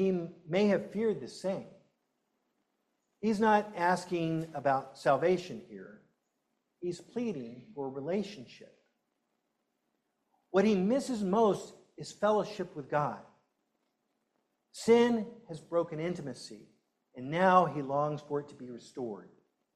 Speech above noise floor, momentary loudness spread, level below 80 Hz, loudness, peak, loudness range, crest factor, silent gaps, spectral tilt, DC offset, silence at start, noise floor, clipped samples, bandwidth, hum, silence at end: 50 dB; 19 LU; -74 dBFS; -31 LUFS; -10 dBFS; 9 LU; 22 dB; none; -6 dB/octave; under 0.1%; 0 s; -81 dBFS; under 0.1%; 12.5 kHz; none; 0.5 s